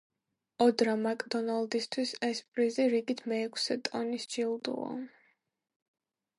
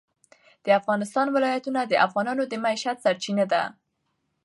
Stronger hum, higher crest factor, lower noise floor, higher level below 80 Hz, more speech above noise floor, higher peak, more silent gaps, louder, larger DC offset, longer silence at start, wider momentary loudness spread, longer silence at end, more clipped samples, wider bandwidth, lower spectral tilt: neither; about the same, 20 dB vs 20 dB; about the same, -75 dBFS vs -75 dBFS; about the same, -84 dBFS vs -80 dBFS; second, 44 dB vs 52 dB; second, -14 dBFS vs -6 dBFS; first, 2.48-2.52 s vs none; second, -32 LUFS vs -24 LUFS; neither; about the same, 0.6 s vs 0.65 s; first, 8 LU vs 5 LU; first, 1.3 s vs 0.75 s; neither; about the same, 11.5 kHz vs 11.5 kHz; about the same, -3.5 dB/octave vs -4.5 dB/octave